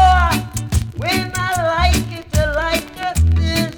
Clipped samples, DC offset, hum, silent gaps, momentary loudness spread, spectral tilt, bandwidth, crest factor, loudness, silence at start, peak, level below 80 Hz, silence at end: under 0.1%; under 0.1%; none; none; 6 LU; -4.5 dB/octave; 19.5 kHz; 14 dB; -18 LUFS; 0 s; -4 dBFS; -22 dBFS; 0 s